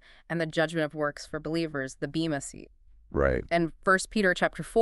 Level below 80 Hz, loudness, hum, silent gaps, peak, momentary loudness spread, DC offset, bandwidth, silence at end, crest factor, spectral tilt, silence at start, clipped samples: -46 dBFS; -29 LUFS; none; none; -10 dBFS; 10 LU; under 0.1%; 11.5 kHz; 0 s; 18 dB; -5 dB/octave; 0.3 s; under 0.1%